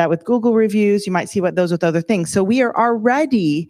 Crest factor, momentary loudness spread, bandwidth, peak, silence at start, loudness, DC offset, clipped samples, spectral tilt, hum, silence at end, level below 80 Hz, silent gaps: 14 dB; 4 LU; 14.5 kHz; -2 dBFS; 0 s; -17 LUFS; under 0.1%; under 0.1%; -6 dB/octave; none; 0.05 s; -60 dBFS; none